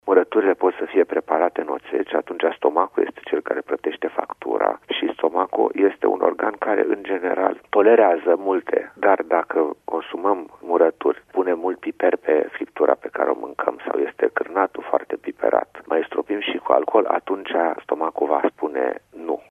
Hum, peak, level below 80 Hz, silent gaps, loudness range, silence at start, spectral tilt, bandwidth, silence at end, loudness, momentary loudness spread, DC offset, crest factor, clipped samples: none; 0 dBFS; -68 dBFS; none; 4 LU; 0.05 s; -6 dB/octave; 3.7 kHz; 0.1 s; -21 LUFS; 8 LU; under 0.1%; 20 dB; under 0.1%